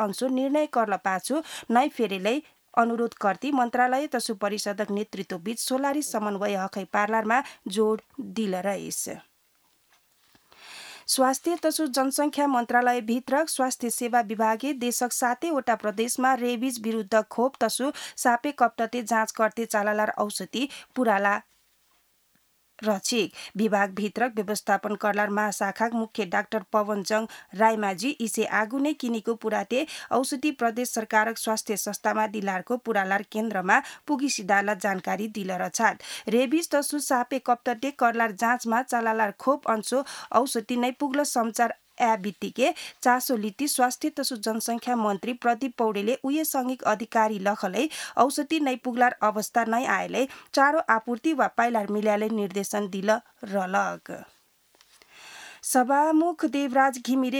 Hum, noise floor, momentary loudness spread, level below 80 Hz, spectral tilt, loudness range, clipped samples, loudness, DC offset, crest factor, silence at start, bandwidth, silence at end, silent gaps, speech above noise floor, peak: none; -67 dBFS; 6 LU; -76 dBFS; -3.5 dB/octave; 3 LU; under 0.1%; -26 LUFS; under 0.1%; 22 dB; 0 s; over 20 kHz; 0 s; none; 41 dB; -4 dBFS